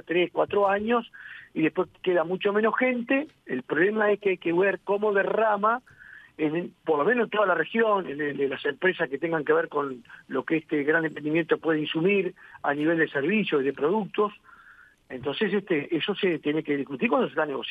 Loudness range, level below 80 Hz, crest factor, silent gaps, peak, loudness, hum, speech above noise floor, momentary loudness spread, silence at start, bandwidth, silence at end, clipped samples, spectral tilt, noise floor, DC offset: 3 LU; -70 dBFS; 16 dB; none; -10 dBFS; -26 LUFS; none; 29 dB; 8 LU; 0.1 s; 4.9 kHz; 0 s; under 0.1%; -8 dB/octave; -54 dBFS; under 0.1%